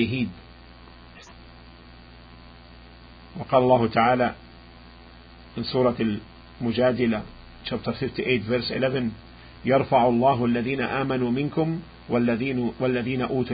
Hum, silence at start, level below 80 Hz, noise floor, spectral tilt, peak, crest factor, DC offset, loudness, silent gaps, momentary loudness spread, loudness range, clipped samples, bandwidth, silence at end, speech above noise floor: 60 Hz at -45 dBFS; 0 s; -50 dBFS; -47 dBFS; -8.5 dB/octave; -6 dBFS; 20 dB; under 0.1%; -24 LUFS; none; 14 LU; 4 LU; under 0.1%; 5 kHz; 0 s; 24 dB